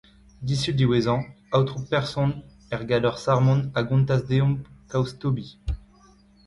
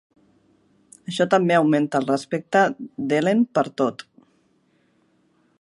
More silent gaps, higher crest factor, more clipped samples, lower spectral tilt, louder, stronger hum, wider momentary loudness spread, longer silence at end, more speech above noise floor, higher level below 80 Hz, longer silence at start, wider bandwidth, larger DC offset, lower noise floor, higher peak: neither; about the same, 16 dB vs 20 dB; neither; about the same, -7 dB/octave vs -6 dB/octave; second, -24 LUFS vs -21 LUFS; neither; about the same, 13 LU vs 12 LU; second, 0.7 s vs 1.7 s; second, 32 dB vs 43 dB; first, -44 dBFS vs -72 dBFS; second, 0.4 s vs 1.1 s; about the same, 11.5 kHz vs 11.5 kHz; neither; second, -55 dBFS vs -64 dBFS; second, -8 dBFS vs -4 dBFS